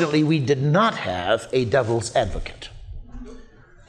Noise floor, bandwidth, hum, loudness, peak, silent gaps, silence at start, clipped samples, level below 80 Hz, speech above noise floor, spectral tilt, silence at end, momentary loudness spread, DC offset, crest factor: -46 dBFS; 10.5 kHz; none; -21 LUFS; -6 dBFS; none; 0 s; under 0.1%; -40 dBFS; 25 dB; -6 dB/octave; 0.45 s; 22 LU; under 0.1%; 16 dB